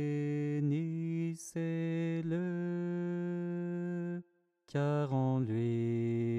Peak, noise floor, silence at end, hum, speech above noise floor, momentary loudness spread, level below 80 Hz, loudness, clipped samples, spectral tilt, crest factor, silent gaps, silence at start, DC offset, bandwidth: -24 dBFS; -66 dBFS; 0 s; none; 34 dB; 6 LU; -82 dBFS; -35 LUFS; under 0.1%; -8 dB/octave; 12 dB; none; 0 s; under 0.1%; 12 kHz